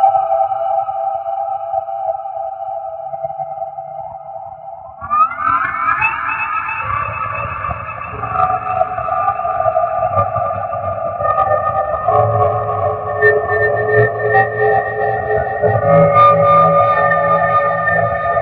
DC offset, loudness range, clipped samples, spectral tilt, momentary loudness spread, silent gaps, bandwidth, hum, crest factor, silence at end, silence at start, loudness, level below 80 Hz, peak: under 0.1%; 10 LU; under 0.1%; -10 dB/octave; 13 LU; none; 4.9 kHz; none; 16 dB; 0 s; 0 s; -15 LUFS; -44 dBFS; 0 dBFS